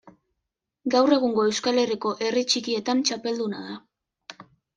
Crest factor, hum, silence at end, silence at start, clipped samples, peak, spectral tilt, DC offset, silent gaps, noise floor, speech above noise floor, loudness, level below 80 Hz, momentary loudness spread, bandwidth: 18 dB; none; 0.35 s; 0.05 s; under 0.1%; -8 dBFS; -3 dB/octave; under 0.1%; none; -83 dBFS; 60 dB; -24 LUFS; -72 dBFS; 17 LU; 10 kHz